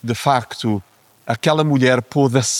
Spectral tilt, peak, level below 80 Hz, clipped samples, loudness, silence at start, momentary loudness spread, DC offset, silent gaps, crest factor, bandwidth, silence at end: -5 dB/octave; -2 dBFS; -58 dBFS; under 0.1%; -18 LUFS; 0.05 s; 11 LU; under 0.1%; none; 16 dB; 16 kHz; 0 s